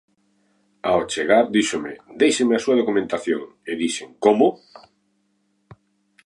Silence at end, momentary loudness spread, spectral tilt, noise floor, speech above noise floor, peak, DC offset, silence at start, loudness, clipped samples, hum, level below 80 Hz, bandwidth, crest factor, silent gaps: 1.7 s; 10 LU; -4 dB/octave; -68 dBFS; 47 dB; -2 dBFS; under 0.1%; 0.85 s; -20 LUFS; under 0.1%; none; -62 dBFS; 11.5 kHz; 20 dB; none